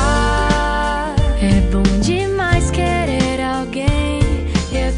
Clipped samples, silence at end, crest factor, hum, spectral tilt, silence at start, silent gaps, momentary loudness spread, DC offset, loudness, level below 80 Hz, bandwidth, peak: under 0.1%; 0 s; 12 dB; none; -5.5 dB/octave; 0 s; none; 4 LU; under 0.1%; -17 LUFS; -20 dBFS; 10.5 kHz; -2 dBFS